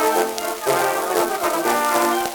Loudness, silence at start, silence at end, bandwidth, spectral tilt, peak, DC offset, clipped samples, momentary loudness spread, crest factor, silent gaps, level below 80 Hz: -20 LUFS; 0 s; 0 s; over 20 kHz; -2 dB/octave; -2 dBFS; under 0.1%; under 0.1%; 3 LU; 18 dB; none; -58 dBFS